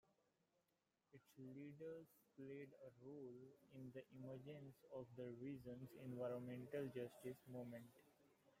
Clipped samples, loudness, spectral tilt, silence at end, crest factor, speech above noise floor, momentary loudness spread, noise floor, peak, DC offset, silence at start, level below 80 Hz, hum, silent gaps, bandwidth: under 0.1%; -56 LUFS; -7.5 dB/octave; 0.05 s; 18 dB; 34 dB; 12 LU; -89 dBFS; -38 dBFS; under 0.1%; 1.15 s; -88 dBFS; none; none; 16 kHz